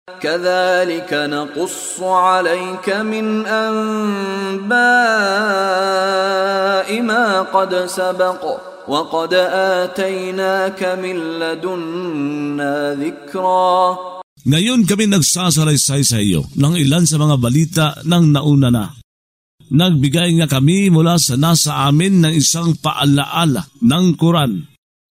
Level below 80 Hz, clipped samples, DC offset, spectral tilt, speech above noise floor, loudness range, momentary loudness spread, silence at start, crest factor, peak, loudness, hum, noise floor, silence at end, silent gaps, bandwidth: -48 dBFS; under 0.1%; under 0.1%; -4.5 dB/octave; over 75 dB; 5 LU; 9 LU; 0.1 s; 14 dB; 0 dBFS; -15 LUFS; none; under -90 dBFS; 0.5 s; 14.23-14.36 s, 19.04-19.58 s; 16 kHz